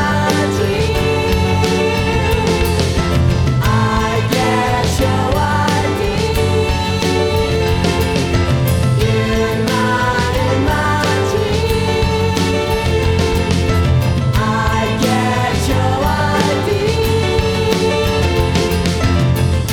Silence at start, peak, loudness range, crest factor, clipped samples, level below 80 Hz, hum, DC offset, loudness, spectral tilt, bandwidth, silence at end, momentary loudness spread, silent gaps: 0 s; 0 dBFS; 1 LU; 14 dB; under 0.1%; -24 dBFS; none; under 0.1%; -15 LUFS; -5.5 dB/octave; 18.5 kHz; 0 s; 1 LU; none